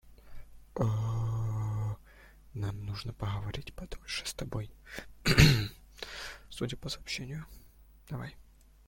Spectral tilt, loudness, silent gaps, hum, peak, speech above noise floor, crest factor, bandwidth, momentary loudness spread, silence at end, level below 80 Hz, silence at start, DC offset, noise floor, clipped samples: -5 dB/octave; -33 LUFS; none; none; -6 dBFS; 26 dB; 28 dB; 16.5 kHz; 19 LU; 0.45 s; -46 dBFS; 0.05 s; under 0.1%; -57 dBFS; under 0.1%